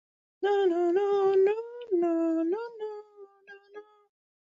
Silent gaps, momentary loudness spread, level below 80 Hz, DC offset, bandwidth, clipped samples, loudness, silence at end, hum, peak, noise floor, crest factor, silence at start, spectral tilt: none; 16 LU; -80 dBFS; under 0.1%; 7.4 kHz; under 0.1%; -27 LUFS; 0.75 s; none; -16 dBFS; -53 dBFS; 12 dB; 0.4 s; -5.5 dB/octave